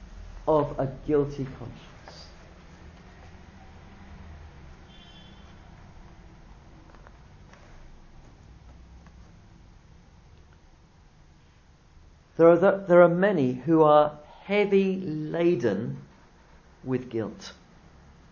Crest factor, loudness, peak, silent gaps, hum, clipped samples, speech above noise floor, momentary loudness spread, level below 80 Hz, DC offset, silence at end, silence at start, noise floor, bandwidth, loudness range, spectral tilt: 22 dB; -24 LUFS; -6 dBFS; none; none; under 0.1%; 33 dB; 28 LU; -52 dBFS; under 0.1%; 0.8 s; 0 s; -56 dBFS; 7 kHz; 13 LU; -8 dB/octave